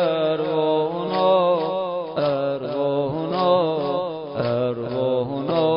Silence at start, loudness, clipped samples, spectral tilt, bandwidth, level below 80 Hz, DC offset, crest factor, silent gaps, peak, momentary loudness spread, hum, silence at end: 0 s; -22 LUFS; under 0.1%; -11 dB/octave; 5.4 kHz; -60 dBFS; under 0.1%; 14 dB; none; -6 dBFS; 6 LU; none; 0 s